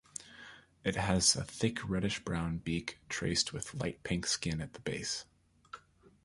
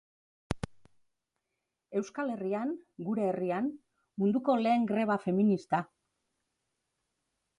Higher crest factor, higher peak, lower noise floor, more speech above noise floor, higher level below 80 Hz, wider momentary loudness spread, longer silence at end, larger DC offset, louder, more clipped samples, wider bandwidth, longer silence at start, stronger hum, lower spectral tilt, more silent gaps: about the same, 22 dB vs 20 dB; about the same, -14 dBFS vs -14 dBFS; second, -57 dBFS vs -86 dBFS; second, 22 dB vs 55 dB; first, -54 dBFS vs -60 dBFS; first, 23 LU vs 12 LU; second, 0.45 s vs 1.75 s; neither; about the same, -34 LUFS vs -32 LUFS; neither; about the same, 11.5 kHz vs 11 kHz; second, 0.2 s vs 0.5 s; neither; second, -3.5 dB/octave vs -7.5 dB/octave; neither